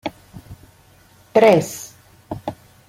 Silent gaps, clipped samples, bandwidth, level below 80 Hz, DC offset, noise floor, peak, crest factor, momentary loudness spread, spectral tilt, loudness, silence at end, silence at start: none; under 0.1%; 16.5 kHz; -54 dBFS; under 0.1%; -51 dBFS; -2 dBFS; 20 dB; 21 LU; -5.5 dB/octave; -17 LUFS; 0.35 s; 0.05 s